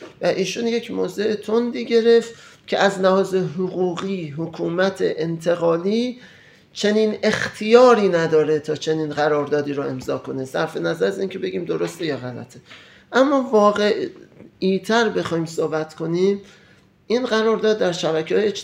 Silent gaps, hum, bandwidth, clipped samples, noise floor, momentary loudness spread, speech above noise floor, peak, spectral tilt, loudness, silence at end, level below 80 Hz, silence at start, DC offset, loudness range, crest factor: none; none; 14 kHz; under 0.1%; -53 dBFS; 10 LU; 33 dB; 0 dBFS; -5.5 dB/octave; -20 LUFS; 0 s; -66 dBFS; 0 s; under 0.1%; 5 LU; 20 dB